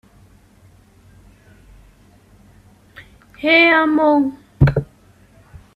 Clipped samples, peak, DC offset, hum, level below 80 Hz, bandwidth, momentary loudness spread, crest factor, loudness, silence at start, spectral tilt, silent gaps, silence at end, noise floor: under 0.1%; 0 dBFS; under 0.1%; none; -40 dBFS; 5.4 kHz; 14 LU; 20 dB; -15 LUFS; 3 s; -8 dB/octave; none; 0.9 s; -50 dBFS